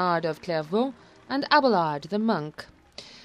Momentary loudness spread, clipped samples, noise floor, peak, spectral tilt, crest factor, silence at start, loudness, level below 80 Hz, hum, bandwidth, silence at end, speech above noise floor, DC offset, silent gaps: 23 LU; under 0.1%; -47 dBFS; -6 dBFS; -6 dB/octave; 20 dB; 0 s; -25 LUFS; -66 dBFS; none; 12.5 kHz; 0.05 s; 22 dB; under 0.1%; none